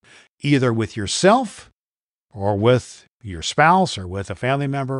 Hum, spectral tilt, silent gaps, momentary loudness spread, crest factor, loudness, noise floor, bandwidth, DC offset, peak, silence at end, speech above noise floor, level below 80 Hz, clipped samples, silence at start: none; -5 dB/octave; 1.73-2.25 s, 3.10-3.18 s; 14 LU; 18 dB; -19 LUFS; under -90 dBFS; 11.5 kHz; under 0.1%; -2 dBFS; 0 s; over 71 dB; -50 dBFS; under 0.1%; 0.45 s